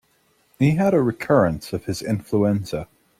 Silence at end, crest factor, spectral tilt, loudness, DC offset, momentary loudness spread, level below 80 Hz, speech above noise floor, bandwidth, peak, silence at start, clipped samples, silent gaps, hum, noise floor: 0.35 s; 18 dB; -7.5 dB/octave; -21 LUFS; under 0.1%; 10 LU; -50 dBFS; 43 dB; 15.5 kHz; -4 dBFS; 0.6 s; under 0.1%; none; none; -63 dBFS